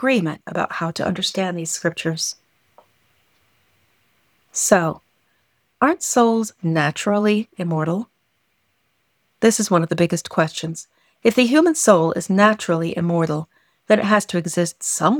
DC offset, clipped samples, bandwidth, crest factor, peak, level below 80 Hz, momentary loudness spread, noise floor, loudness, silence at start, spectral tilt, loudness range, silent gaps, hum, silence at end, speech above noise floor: under 0.1%; under 0.1%; 19.5 kHz; 18 dB; -2 dBFS; -62 dBFS; 10 LU; -68 dBFS; -19 LUFS; 0 s; -4.5 dB/octave; 7 LU; none; none; 0 s; 49 dB